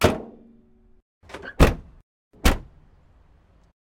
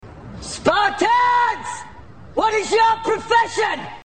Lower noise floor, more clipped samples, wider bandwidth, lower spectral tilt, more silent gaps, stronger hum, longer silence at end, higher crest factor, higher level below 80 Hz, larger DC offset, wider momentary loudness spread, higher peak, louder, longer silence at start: first, -56 dBFS vs -41 dBFS; neither; first, 16.5 kHz vs 9.4 kHz; first, -5.5 dB/octave vs -3 dB/octave; first, 1.02-1.21 s, 2.03-2.31 s vs none; neither; first, 1.25 s vs 0.1 s; about the same, 20 dB vs 18 dB; first, -30 dBFS vs -48 dBFS; second, under 0.1% vs 0.6%; first, 21 LU vs 15 LU; about the same, -4 dBFS vs -2 dBFS; second, -23 LUFS vs -18 LUFS; about the same, 0 s vs 0.05 s